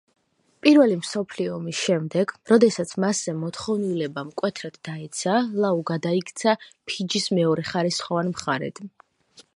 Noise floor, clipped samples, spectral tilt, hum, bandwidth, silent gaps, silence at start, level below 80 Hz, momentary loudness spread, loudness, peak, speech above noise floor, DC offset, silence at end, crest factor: -55 dBFS; under 0.1%; -5 dB/octave; none; 11.5 kHz; none; 0.65 s; -68 dBFS; 12 LU; -23 LUFS; -2 dBFS; 32 dB; under 0.1%; 0.15 s; 22 dB